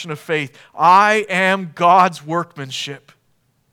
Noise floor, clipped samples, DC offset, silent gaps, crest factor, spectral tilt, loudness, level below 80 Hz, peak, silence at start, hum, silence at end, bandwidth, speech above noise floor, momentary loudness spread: -63 dBFS; under 0.1%; under 0.1%; none; 18 dB; -4.5 dB/octave; -16 LUFS; -74 dBFS; 0 dBFS; 0 s; none; 0.75 s; 17 kHz; 46 dB; 14 LU